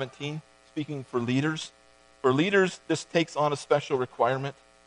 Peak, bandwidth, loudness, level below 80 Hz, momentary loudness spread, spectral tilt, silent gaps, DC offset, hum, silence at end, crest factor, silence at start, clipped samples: -8 dBFS; 10.5 kHz; -28 LUFS; -70 dBFS; 13 LU; -5.5 dB/octave; none; under 0.1%; none; 0.35 s; 20 dB; 0 s; under 0.1%